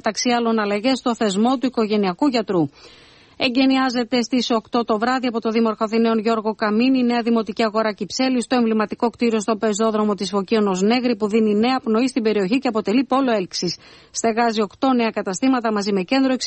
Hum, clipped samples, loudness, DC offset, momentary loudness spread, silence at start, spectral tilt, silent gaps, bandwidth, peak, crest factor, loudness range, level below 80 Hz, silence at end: none; under 0.1%; -20 LUFS; under 0.1%; 4 LU; 0.05 s; -4.5 dB/octave; none; 8.8 kHz; -4 dBFS; 14 dB; 1 LU; -60 dBFS; 0 s